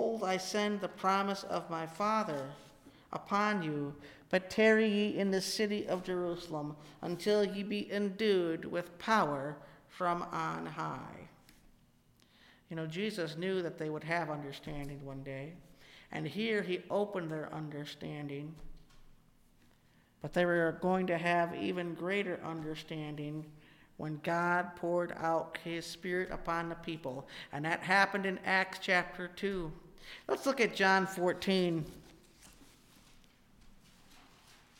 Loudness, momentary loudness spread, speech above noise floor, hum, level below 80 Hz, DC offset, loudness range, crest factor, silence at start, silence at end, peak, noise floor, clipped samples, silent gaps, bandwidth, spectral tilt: -35 LUFS; 14 LU; 32 dB; none; -62 dBFS; under 0.1%; 8 LU; 22 dB; 0 s; 0.6 s; -14 dBFS; -67 dBFS; under 0.1%; none; 16.5 kHz; -5 dB/octave